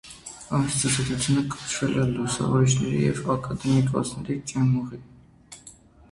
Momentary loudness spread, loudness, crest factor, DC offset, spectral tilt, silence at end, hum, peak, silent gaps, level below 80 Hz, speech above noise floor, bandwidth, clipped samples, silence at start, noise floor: 17 LU; -24 LUFS; 16 dB; under 0.1%; -5 dB/octave; 0.4 s; none; -10 dBFS; none; -50 dBFS; 26 dB; 11.5 kHz; under 0.1%; 0.05 s; -50 dBFS